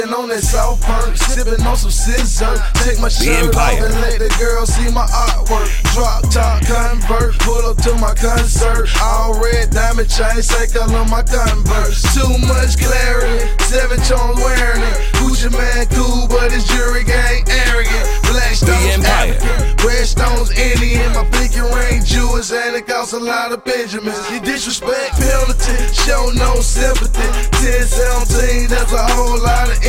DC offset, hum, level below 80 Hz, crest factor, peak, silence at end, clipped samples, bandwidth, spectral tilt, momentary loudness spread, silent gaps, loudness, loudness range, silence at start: under 0.1%; none; -12 dBFS; 12 dB; 0 dBFS; 0 s; under 0.1%; 16 kHz; -4 dB/octave; 4 LU; none; -15 LUFS; 2 LU; 0 s